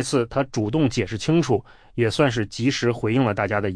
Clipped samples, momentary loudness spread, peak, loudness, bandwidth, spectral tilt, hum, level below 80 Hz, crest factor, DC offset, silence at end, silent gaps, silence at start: under 0.1%; 5 LU; -6 dBFS; -22 LUFS; 10.5 kHz; -6 dB/octave; none; -48 dBFS; 16 dB; under 0.1%; 0 s; none; 0 s